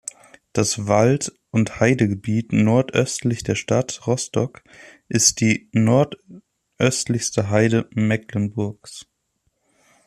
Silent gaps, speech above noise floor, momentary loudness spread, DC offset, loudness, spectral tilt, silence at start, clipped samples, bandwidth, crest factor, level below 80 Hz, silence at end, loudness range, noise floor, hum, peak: none; 51 dB; 10 LU; under 0.1%; -20 LUFS; -5 dB/octave; 0.55 s; under 0.1%; 13.5 kHz; 20 dB; -54 dBFS; 1.05 s; 3 LU; -71 dBFS; none; -2 dBFS